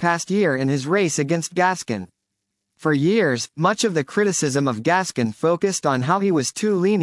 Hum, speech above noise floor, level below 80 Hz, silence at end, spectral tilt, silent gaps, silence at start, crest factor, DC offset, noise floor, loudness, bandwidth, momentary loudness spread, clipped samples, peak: none; 58 dB; -70 dBFS; 0 s; -5 dB/octave; none; 0 s; 16 dB; under 0.1%; -78 dBFS; -20 LUFS; 12 kHz; 3 LU; under 0.1%; -6 dBFS